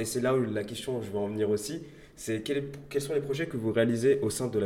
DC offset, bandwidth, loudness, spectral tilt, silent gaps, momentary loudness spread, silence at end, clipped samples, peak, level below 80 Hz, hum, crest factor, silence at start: under 0.1%; 16.5 kHz; -30 LUFS; -5.5 dB/octave; none; 9 LU; 0 s; under 0.1%; -12 dBFS; -60 dBFS; none; 18 dB; 0 s